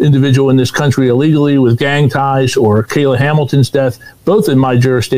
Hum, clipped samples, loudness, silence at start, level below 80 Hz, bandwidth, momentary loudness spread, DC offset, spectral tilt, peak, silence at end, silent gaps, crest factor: none; under 0.1%; -11 LUFS; 0 s; -44 dBFS; 16 kHz; 3 LU; 1%; -7 dB/octave; -2 dBFS; 0 s; none; 8 dB